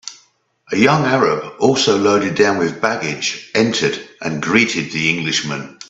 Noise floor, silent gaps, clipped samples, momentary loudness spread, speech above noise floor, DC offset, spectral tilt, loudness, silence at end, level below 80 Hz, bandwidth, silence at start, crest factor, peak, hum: -56 dBFS; none; under 0.1%; 9 LU; 39 dB; under 0.1%; -4 dB/octave; -16 LUFS; 0.05 s; -58 dBFS; 8 kHz; 0.05 s; 18 dB; 0 dBFS; none